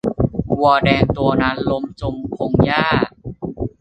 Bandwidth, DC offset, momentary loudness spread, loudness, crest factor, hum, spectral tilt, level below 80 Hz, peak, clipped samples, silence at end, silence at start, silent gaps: 8.6 kHz; under 0.1%; 12 LU; -18 LUFS; 16 dB; none; -8 dB/octave; -36 dBFS; 0 dBFS; under 0.1%; 0.15 s; 0.05 s; none